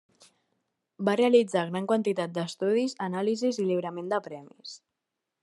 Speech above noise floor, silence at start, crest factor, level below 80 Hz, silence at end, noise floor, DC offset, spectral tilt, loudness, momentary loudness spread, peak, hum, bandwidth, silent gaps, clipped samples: 58 dB; 1 s; 20 dB; -82 dBFS; 0.65 s; -85 dBFS; under 0.1%; -5.5 dB/octave; -27 LUFS; 21 LU; -10 dBFS; none; 11.5 kHz; none; under 0.1%